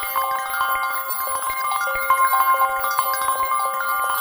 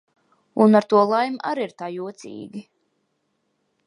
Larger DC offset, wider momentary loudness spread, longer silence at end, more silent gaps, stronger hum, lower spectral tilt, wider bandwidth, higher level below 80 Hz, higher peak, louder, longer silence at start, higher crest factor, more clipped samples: neither; second, 5 LU vs 21 LU; second, 0 s vs 1.25 s; neither; neither; second, 1 dB/octave vs -7 dB/octave; first, over 20 kHz vs 10.5 kHz; first, -54 dBFS vs -74 dBFS; about the same, -4 dBFS vs -2 dBFS; about the same, -20 LUFS vs -20 LUFS; second, 0 s vs 0.55 s; about the same, 16 dB vs 20 dB; neither